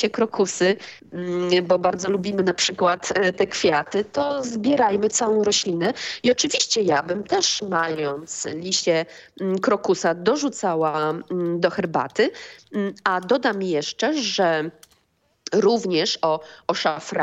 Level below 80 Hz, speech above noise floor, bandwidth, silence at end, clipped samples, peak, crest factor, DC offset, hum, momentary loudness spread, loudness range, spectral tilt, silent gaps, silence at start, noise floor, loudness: -64 dBFS; 44 dB; 8.6 kHz; 0 s; under 0.1%; -4 dBFS; 18 dB; under 0.1%; none; 8 LU; 3 LU; -3.5 dB/octave; none; 0 s; -66 dBFS; -22 LUFS